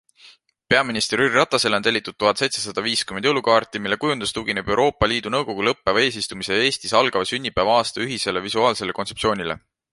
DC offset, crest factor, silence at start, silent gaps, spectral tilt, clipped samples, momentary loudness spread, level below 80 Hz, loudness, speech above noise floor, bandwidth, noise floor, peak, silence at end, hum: under 0.1%; 20 dB; 0.25 s; none; -3 dB/octave; under 0.1%; 6 LU; -48 dBFS; -20 LUFS; 30 dB; 11.5 kHz; -51 dBFS; -2 dBFS; 0.35 s; none